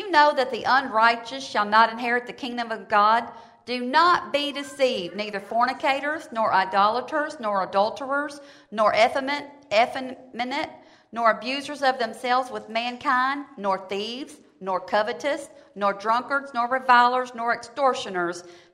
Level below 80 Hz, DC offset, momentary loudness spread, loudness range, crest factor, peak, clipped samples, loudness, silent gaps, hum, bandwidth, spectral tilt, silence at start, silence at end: -70 dBFS; under 0.1%; 13 LU; 4 LU; 20 dB; -4 dBFS; under 0.1%; -23 LUFS; none; none; 13 kHz; -3.5 dB/octave; 0 s; 0.15 s